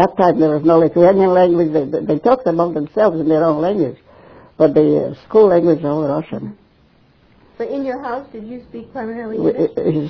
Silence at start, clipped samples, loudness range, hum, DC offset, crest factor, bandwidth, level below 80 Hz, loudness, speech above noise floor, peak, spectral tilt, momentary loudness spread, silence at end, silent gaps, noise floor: 0 s; under 0.1%; 11 LU; none; under 0.1%; 16 dB; 5.4 kHz; -52 dBFS; -15 LUFS; 38 dB; 0 dBFS; -9.5 dB/octave; 16 LU; 0 s; none; -52 dBFS